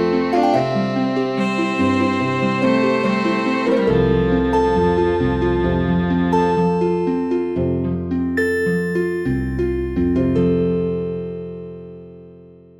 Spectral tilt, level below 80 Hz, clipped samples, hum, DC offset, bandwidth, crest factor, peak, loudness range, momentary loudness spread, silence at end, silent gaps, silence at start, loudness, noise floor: -7.5 dB/octave; -34 dBFS; under 0.1%; none; 0.2%; 13 kHz; 14 dB; -4 dBFS; 3 LU; 5 LU; 0.25 s; none; 0 s; -18 LUFS; -43 dBFS